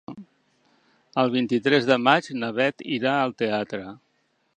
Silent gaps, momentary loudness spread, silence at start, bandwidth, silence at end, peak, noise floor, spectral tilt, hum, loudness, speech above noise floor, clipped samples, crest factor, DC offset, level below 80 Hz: none; 15 LU; 0.1 s; 9.4 kHz; 0.6 s; -2 dBFS; -69 dBFS; -5.5 dB/octave; none; -23 LUFS; 47 dB; under 0.1%; 24 dB; under 0.1%; -70 dBFS